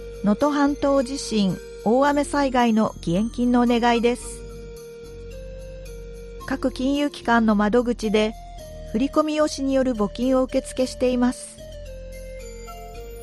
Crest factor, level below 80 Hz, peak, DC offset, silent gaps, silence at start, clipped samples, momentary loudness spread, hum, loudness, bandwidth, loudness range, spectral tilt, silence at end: 18 dB; -40 dBFS; -6 dBFS; under 0.1%; none; 0 s; under 0.1%; 20 LU; none; -22 LUFS; 12.5 kHz; 5 LU; -5.5 dB/octave; 0 s